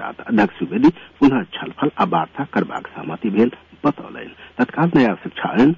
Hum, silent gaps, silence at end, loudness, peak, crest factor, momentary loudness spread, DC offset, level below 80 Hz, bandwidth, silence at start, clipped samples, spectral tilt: none; none; 0 s; -19 LUFS; -4 dBFS; 14 dB; 13 LU; under 0.1%; -54 dBFS; 7.2 kHz; 0 s; under 0.1%; -8 dB/octave